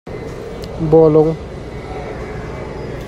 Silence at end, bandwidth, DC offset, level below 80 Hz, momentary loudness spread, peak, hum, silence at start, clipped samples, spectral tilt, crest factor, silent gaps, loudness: 0 s; 8.6 kHz; under 0.1%; -34 dBFS; 18 LU; 0 dBFS; none; 0.05 s; under 0.1%; -8.5 dB/octave; 16 dB; none; -16 LUFS